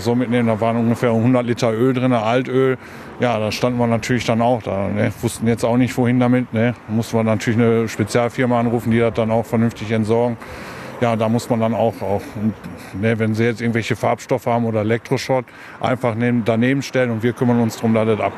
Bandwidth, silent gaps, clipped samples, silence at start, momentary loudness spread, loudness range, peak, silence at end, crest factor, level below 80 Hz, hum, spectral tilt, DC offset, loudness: 14 kHz; none; under 0.1%; 0 s; 6 LU; 2 LU; -2 dBFS; 0 s; 16 dB; -50 dBFS; none; -6.5 dB/octave; under 0.1%; -18 LUFS